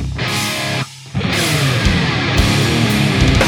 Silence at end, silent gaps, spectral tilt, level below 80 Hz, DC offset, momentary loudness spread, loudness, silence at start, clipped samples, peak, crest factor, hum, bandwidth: 0 s; none; -4.5 dB/octave; -26 dBFS; under 0.1%; 7 LU; -15 LUFS; 0 s; under 0.1%; 0 dBFS; 14 dB; none; 19.5 kHz